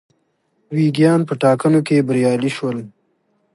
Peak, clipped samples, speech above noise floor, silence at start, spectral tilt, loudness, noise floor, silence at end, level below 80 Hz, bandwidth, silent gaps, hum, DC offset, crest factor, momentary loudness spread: -2 dBFS; under 0.1%; 50 dB; 0.7 s; -7 dB/octave; -17 LUFS; -65 dBFS; 0.65 s; -64 dBFS; 11.5 kHz; none; none; under 0.1%; 16 dB; 10 LU